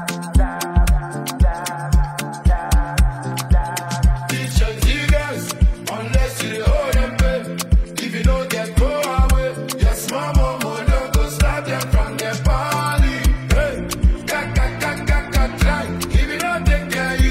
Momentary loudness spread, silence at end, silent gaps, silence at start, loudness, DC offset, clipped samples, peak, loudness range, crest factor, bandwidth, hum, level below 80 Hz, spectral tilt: 4 LU; 0 s; none; 0 s; -20 LUFS; under 0.1%; under 0.1%; -4 dBFS; 1 LU; 14 dB; 16 kHz; none; -18 dBFS; -5 dB/octave